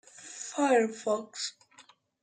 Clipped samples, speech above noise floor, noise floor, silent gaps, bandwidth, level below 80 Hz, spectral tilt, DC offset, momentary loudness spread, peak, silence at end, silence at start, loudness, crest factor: under 0.1%; 31 dB; -60 dBFS; none; 9.6 kHz; -86 dBFS; -2.5 dB/octave; under 0.1%; 14 LU; -14 dBFS; 0.4 s; 0.2 s; -30 LUFS; 18 dB